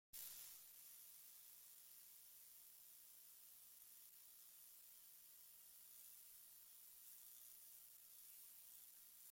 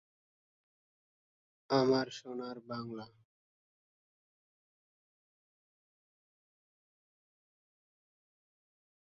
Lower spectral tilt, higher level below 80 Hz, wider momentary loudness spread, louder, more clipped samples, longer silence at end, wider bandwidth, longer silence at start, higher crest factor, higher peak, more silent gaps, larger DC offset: second, 1.5 dB/octave vs -4.5 dB/octave; second, under -90 dBFS vs -80 dBFS; second, 3 LU vs 17 LU; second, -60 LUFS vs -35 LUFS; neither; second, 0 s vs 5.95 s; first, 16.5 kHz vs 7.2 kHz; second, 0.15 s vs 1.7 s; about the same, 26 dB vs 26 dB; second, -38 dBFS vs -16 dBFS; neither; neither